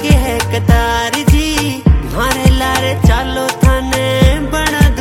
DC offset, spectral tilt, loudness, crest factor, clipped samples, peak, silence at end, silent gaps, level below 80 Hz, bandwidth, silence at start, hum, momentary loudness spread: under 0.1%; -5 dB/octave; -13 LUFS; 12 dB; 0.1%; 0 dBFS; 0 s; none; -16 dBFS; 16.5 kHz; 0 s; none; 3 LU